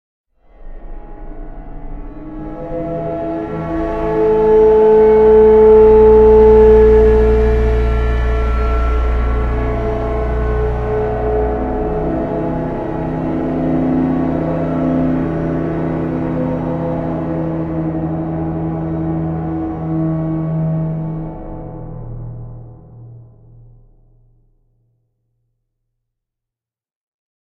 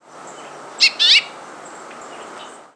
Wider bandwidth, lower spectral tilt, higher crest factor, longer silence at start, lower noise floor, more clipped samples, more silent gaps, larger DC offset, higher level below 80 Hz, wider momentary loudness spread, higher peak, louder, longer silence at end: second, 4.7 kHz vs 11 kHz; first, -10 dB/octave vs 1.5 dB/octave; second, 14 dB vs 20 dB; first, 0.6 s vs 0.25 s; first, -86 dBFS vs -38 dBFS; neither; neither; neither; first, -22 dBFS vs -80 dBFS; second, 22 LU vs 25 LU; about the same, 0 dBFS vs -2 dBFS; about the same, -14 LUFS vs -12 LUFS; first, 4.25 s vs 0.3 s